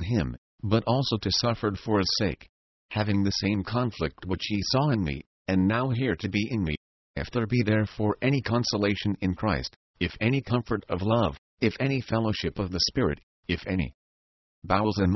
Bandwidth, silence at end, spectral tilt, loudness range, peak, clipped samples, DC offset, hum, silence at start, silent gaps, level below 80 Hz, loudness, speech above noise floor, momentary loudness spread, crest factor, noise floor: 6.2 kHz; 0 s; -6 dB/octave; 1 LU; -8 dBFS; under 0.1%; under 0.1%; none; 0 s; 0.38-0.58 s, 2.49-2.89 s, 5.26-5.45 s, 6.77-7.14 s, 9.76-9.94 s, 11.38-11.58 s, 13.23-13.43 s, 13.94-14.62 s; -44 dBFS; -27 LUFS; over 64 dB; 8 LU; 20 dB; under -90 dBFS